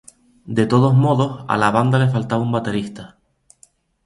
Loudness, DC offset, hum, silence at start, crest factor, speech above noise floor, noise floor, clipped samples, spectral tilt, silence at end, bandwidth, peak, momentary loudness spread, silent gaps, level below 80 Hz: -18 LUFS; under 0.1%; none; 0.45 s; 18 dB; 38 dB; -55 dBFS; under 0.1%; -7.5 dB/octave; 1 s; 11.5 kHz; 0 dBFS; 11 LU; none; -52 dBFS